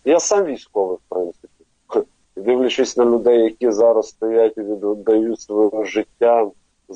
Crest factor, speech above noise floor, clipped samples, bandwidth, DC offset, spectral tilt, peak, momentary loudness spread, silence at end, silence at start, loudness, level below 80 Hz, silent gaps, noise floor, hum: 14 dB; 34 dB; under 0.1%; 8.6 kHz; under 0.1%; -3.5 dB/octave; -4 dBFS; 9 LU; 0 s; 0.05 s; -18 LUFS; -60 dBFS; none; -50 dBFS; none